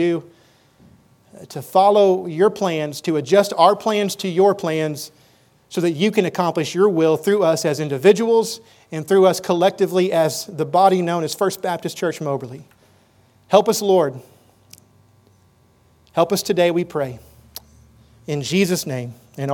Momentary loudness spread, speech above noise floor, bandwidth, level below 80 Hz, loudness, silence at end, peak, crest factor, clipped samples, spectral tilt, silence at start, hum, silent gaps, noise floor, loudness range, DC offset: 14 LU; 38 dB; 19 kHz; -62 dBFS; -18 LUFS; 0 s; 0 dBFS; 20 dB; under 0.1%; -5 dB/octave; 0 s; none; none; -56 dBFS; 5 LU; under 0.1%